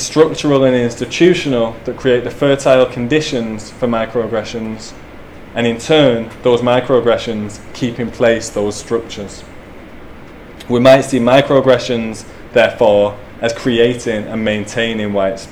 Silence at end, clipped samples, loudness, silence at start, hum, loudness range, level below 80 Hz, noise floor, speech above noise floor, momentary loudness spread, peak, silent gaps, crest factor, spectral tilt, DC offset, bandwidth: 0 s; under 0.1%; -14 LUFS; 0 s; none; 5 LU; -40 dBFS; -34 dBFS; 20 dB; 13 LU; 0 dBFS; none; 14 dB; -5 dB/octave; under 0.1%; 13.5 kHz